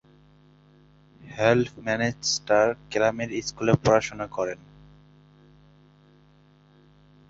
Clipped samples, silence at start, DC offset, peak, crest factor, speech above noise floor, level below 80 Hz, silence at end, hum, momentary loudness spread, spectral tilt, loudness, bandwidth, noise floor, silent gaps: under 0.1%; 1.2 s; under 0.1%; -4 dBFS; 22 dB; 33 dB; -56 dBFS; 2.75 s; 50 Hz at -55 dBFS; 10 LU; -4.5 dB/octave; -24 LUFS; 8 kHz; -57 dBFS; none